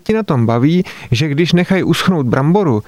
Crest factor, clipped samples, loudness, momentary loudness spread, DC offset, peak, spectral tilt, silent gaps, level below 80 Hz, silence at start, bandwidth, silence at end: 12 dB; under 0.1%; -14 LUFS; 4 LU; under 0.1%; -2 dBFS; -7 dB/octave; none; -42 dBFS; 0.05 s; 13.5 kHz; 0.05 s